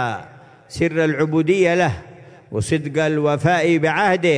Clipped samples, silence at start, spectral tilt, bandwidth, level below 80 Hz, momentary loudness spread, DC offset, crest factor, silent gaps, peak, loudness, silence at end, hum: under 0.1%; 0 s; -6 dB/octave; 10.5 kHz; -52 dBFS; 11 LU; under 0.1%; 14 dB; none; -4 dBFS; -18 LUFS; 0 s; none